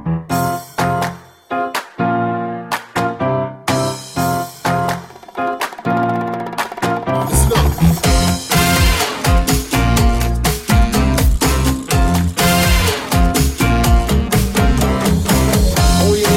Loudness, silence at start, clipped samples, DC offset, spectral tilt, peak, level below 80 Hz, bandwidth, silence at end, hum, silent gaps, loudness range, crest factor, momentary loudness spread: -16 LUFS; 0 s; under 0.1%; under 0.1%; -5 dB/octave; 0 dBFS; -20 dBFS; 16.5 kHz; 0 s; none; none; 5 LU; 14 dB; 8 LU